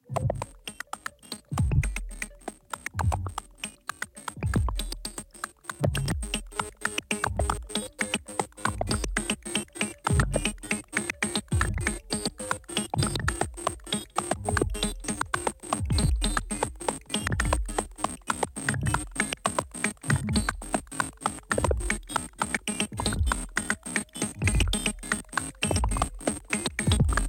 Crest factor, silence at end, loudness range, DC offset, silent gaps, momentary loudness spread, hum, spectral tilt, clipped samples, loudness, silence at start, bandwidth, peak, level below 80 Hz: 22 dB; 0 s; 4 LU; under 0.1%; none; 10 LU; none; -4 dB/octave; under 0.1%; -30 LUFS; 0.1 s; 17 kHz; -8 dBFS; -36 dBFS